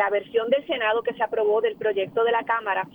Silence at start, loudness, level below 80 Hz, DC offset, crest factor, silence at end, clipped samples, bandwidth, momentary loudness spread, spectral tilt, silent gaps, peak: 0 s; -24 LUFS; -66 dBFS; under 0.1%; 14 dB; 0.05 s; under 0.1%; 19 kHz; 3 LU; -6 dB/octave; none; -10 dBFS